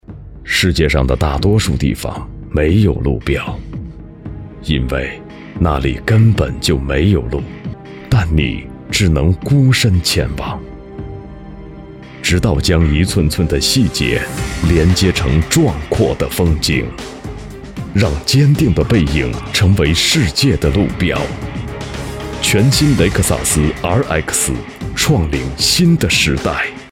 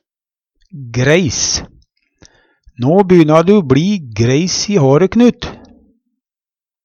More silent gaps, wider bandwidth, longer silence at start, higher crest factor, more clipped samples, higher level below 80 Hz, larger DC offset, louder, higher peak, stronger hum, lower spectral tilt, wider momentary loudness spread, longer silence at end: neither; first, 17 kHz vs 8 kHz; second, 0.1 s vs 0.75 s; about the same, 14 dB vs 14 dB; neither; first, -24 dBFS vs -42 dBFS; neither; about the same, -14 LUFS vs -12 LUFS; about the same, 0 dBFS vs 0 dBFS; neither; about the same, -5 dB/octave vs -5.5 dB/octave; first, 18 LU vs 11 LU; second, 0.05 s vs 1.3 s